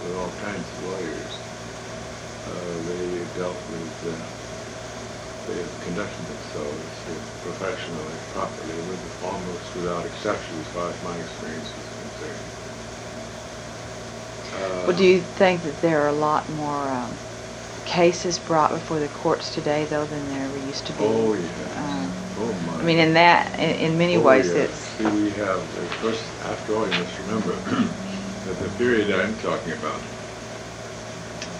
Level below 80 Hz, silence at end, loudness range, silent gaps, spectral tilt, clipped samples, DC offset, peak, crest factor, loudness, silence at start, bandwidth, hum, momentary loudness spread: -50 dBFS; 0 s; 12 LU; none; -5 dB/octave; under 0.1%; under 0.1%; 0 dBFS; 24 dB; -25 LUFS; 0 s; 12 kHz; none; 16 LU